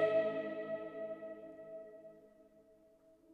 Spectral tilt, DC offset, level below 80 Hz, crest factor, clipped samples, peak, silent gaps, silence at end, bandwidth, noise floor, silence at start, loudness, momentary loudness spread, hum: -7 dB/octave; under 0.1%; -84 dBFS; 20 dB; under 0.1%; -22 dBFS; none; 0 s; 4.9 kHz; -66 dBFS; 0 s; -41 LUFS; 22 LU; none